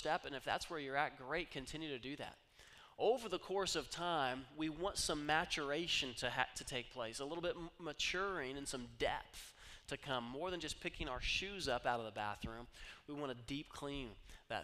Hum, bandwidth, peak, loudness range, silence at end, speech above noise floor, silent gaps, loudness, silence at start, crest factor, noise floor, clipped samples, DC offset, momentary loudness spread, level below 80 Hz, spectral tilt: none; 15.5 kHz; -18 dBFS; 4 LU; 0 s; 21 dB; none; -42 LUFS; 0 s; 24 dB; -63 dBFS; under 0.1%; under 0.1%; 13 LU; -60 dBFS; -3 dB/octave